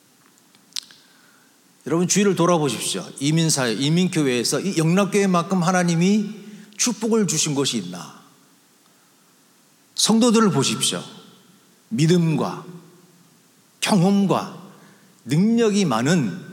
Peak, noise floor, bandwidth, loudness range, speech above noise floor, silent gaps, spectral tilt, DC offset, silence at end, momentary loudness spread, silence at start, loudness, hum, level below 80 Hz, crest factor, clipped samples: -4 dBFS; -56 dBFS; 17 kHz; 5 LU; 37 dB; none; -4.5 dB/octave; under 0.1%; 0 s; 15 LU; 0.75 s; -20 LUFS; none; -76 dBFS; 18 dB; under 0.1%